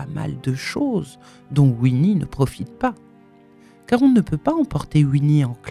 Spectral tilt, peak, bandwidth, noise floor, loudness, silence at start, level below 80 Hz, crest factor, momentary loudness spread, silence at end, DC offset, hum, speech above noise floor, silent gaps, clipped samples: -8 dB/octave; -2 dBFS; 12.5 kHz; -49 dBFS; -20 LUFS; 0 s; -46 dBFS; 16 dB; 9 LU; 0 s; under 0.1%; none; 30 dB; none; under 0.1%